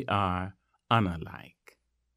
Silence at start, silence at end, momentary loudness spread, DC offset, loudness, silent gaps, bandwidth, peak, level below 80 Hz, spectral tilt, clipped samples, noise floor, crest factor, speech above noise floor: 0 s; 0.7 s; 16 LU; under 0.1%; -30 LUFS; none; 15 kHz; -8 dBFS; -56 dBFS; -7.5 dB/octave; under 0.1%; -62 dBFS; 22 dB; 33 dB